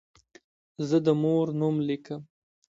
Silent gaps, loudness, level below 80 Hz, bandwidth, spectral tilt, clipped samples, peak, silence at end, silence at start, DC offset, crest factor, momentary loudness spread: none; -27 LUFS; -70 dBFS; 7.8 kHz; -8 dB/octave; under 0.1%; -12 dBFS; 0.5 s; 0.8 s; under 0.1%; 18 dB; 14 LU